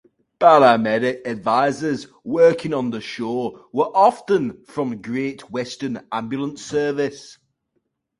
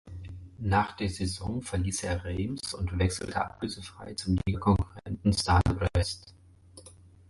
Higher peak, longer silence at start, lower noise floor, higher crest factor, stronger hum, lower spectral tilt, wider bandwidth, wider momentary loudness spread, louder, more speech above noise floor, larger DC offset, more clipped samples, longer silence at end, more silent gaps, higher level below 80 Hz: first, 0 dBFS vs -12 dBFS; first, 0.4 s vs 0.05 s; first, -73 dBFS vs -53 dBFS; about the same, 20 dB vs 18 dB; neither; about the same, -5.5 dB/octave vs -5.5 dB/octave; about the same, 11.5 kHz vs 11.5 kHz; about the same, 13 LU vs 13 LU; first, -20 LUFS vs -30 LUFS; first, 53 dB vs 24 dB; neither; neither; first, 0.85 s vs 0.4 s; neither; second, -62 dBFS vs -38 dBFS